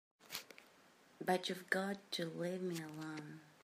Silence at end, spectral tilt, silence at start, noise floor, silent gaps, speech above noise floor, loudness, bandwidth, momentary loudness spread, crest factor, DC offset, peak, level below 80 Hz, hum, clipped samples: 0.1 s; -4.5 dB/octave; 0.2 s; -67 dBFS; none; 25 dB; -42 LUFS; 15.5 kHz; 12 LU; 24 dB; under 0.1%; -20 dBFS; -90 dBFS; none; under 0.1%